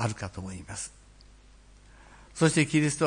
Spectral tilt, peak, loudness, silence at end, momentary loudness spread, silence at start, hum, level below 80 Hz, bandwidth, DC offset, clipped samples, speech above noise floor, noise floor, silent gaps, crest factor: -5 dB/octave; -10 dBFS; -28 LUFS; 0 s; 17 LU; 0 s; 50 Hz at -55 dBFS; -54 dBFS; 10.5 kHz; under 0.1%; under 0.1%; 27 dB; -54 dBFS; none; 20 dB